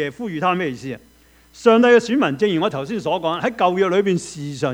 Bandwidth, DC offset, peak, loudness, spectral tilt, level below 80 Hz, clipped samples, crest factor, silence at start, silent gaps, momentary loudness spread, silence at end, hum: 11 kHz; under 0.1%; 0 dBFS; -18 LUFS; -5.5 dB/octave; -56 dBFS; under 0.1%; 18 dB; 0 s; none; 12 LU; 0 s; none